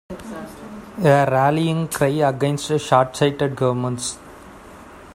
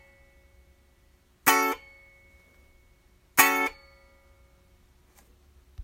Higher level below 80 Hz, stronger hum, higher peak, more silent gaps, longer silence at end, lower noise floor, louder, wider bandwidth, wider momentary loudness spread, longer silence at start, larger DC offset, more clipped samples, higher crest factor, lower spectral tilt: first, -52 dBFS vs -60 dBFS; neither; about the same, 0 dBFS vs -2 dBFS; neither; about the same, 0 s vs 0 s; second, -41 dBFS vs -62 dBFS; first, -19 LUFS vs -23 LUFS; about the same, 16 kHz vs 16.5 kHz; first, 18 LU vs 10 LU; second, 0.1 s vs 1.45 s; neither; neither; second, 20 dB vs 30 dB; first, -5.5 dB/octave vs -1 dB/octave